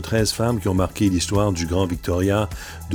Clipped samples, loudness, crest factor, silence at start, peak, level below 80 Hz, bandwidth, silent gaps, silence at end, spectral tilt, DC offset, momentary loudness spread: under 0.1%; -21 LUFS; 16 dB; 0 s; -6 dBFS; -36 dBFS; over 20 kHz; none; 0 s; -5.5 dB/octave; under 0.1%; 3 LU